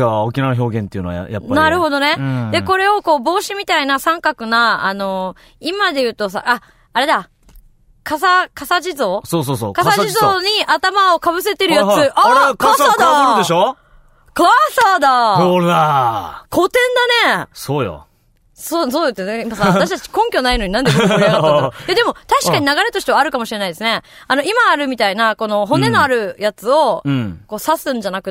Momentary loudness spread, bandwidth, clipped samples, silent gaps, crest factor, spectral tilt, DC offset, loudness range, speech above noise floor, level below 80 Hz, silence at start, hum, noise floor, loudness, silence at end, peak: 9 LU; 16.5 kHz; under 0.1%; none; 14 dB; -4.5 dB/octave; under 0.1%; 5 LU; 40 dB; -42 dBFS; 0 s; none; -54 dBFS; -14 LUFS; 0 s; -2 dBFS